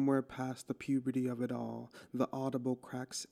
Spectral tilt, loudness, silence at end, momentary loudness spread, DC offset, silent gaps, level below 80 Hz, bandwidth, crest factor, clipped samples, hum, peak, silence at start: -6 dB/octave; -38 LUFS; 0.05 s; 8 LU; under 0.1%; none; -74 dBFS; 14 kHz; 18 dB; under 0.1%; none; -18 dBFS; 0 s